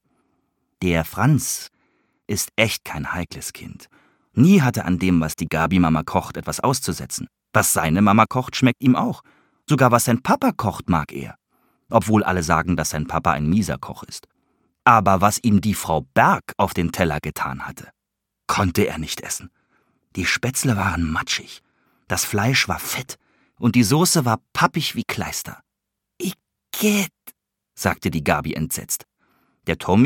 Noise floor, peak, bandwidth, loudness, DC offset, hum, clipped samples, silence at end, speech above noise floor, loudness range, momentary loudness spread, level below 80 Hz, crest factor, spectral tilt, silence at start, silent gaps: -81 dBFS; 0 dBFS; 17.5 kHz; -20 LUFS; under 0.1%; none; under 0.1%; 0 s; 61 dB; 5 LU; 14 LU; -44 dBFS; 22 dB; -4.5 dB/octave; 0.8 s; none